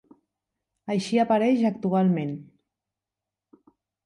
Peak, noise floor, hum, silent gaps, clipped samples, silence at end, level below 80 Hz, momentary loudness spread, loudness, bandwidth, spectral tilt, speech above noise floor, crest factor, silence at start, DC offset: -10 dBFS; -88 dBFS; none; none; under 0.1%; 1.65 s; -72 dBFS; 14 LU; -24 LUFS; 11.5 kHz; -7 dB/octave; 66 dB; 16 dB; 0.85 s; under 0.1%